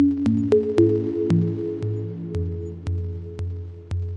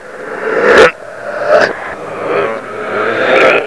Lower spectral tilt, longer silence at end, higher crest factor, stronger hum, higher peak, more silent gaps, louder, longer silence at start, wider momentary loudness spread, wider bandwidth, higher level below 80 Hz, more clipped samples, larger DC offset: first, -10 dB/octave vs -4 dB/octave; about the same, 0 s vs 0 s; first, 18 dB vs 12 dB; neither; second, -4 dBFS vs 0 dBFS; neither; second, -24 LUFS vs -11 LUFS; about the same, 0 s vs 0 s; second, 12 LU vs 16 LU; second, 9.2 kHz vs 11 kHz; about the same, -48 dBFS vs -46 dBFS; second, under 0.1% vs 1%; second, under 0.1% vs 0.7%